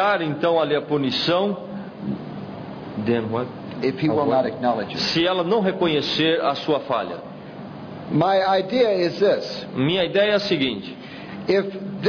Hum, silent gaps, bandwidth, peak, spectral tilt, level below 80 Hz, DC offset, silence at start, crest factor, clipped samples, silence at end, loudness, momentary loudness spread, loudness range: none; none; 5.4 kHz; -6 dBFS; -6 dB/octave; -58 dBFS; under 0.1%; 0 s; 16 dB; under 0.1%; 0 s; -22 LUFS; 15 LU; 4 LU